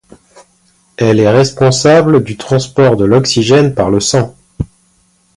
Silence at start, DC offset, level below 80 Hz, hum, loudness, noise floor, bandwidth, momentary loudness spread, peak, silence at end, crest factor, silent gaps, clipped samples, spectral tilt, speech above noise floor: 1 s; under 0.1%; -38 dBFS; none; -10 LUFS; -53 dBFS; 11.5 kHz; 14 LU; 0 dBFS; 0.7 s; 12 dB; none; under 0.1%; -5.5 dB/octave; 44 dB